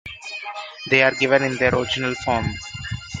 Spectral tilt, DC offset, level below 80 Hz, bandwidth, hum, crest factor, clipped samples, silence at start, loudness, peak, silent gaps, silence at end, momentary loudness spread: -4.5 dB/octave; under 0.1%; -46 dBFS; 9.6 kHz; none; 22 dB; under 0.1%; 0.05 s; -20 LUFS; 0 dBFS; none; 0 s; 15 LU